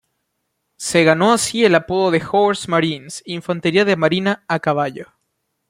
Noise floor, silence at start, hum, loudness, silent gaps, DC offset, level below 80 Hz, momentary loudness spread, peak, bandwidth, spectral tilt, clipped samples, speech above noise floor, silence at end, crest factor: -73 dBFS; 0.8 s; none; -17 LUFS; none; under 0.1%; -58 dBFS; 12 LU; -2 dBFS; 16 kHz; -4.5 dB/octave; under 0.1%; 56 dB; 0.65 s; 16 dB